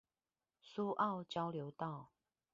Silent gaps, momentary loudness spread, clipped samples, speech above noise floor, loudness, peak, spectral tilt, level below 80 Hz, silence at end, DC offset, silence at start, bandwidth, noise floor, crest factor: none; 11 LU; under 0.1%; over 49 dB; -42 LUFS; -24 dBFS; -5 dB/octave; -84 dBFS; 0.5 s; under 0.1%; 0.65 s; 7.4 kHz; under -90 dBFS; 20 dB